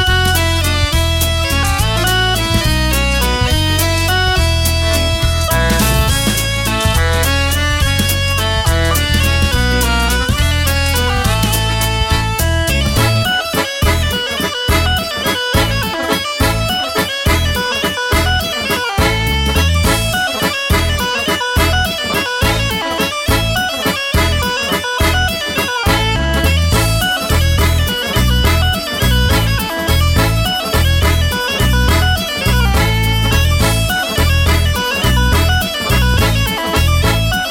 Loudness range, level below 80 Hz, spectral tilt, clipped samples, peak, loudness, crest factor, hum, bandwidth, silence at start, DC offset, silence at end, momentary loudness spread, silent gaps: 1 LU; -20 dBFS; -4 dB/octave; under 0.1%; -2 dBFS; -14 LUFS; 12 dB; none; 17 kHz; 0 s; under 0.1%; 0 s; 3 LU; none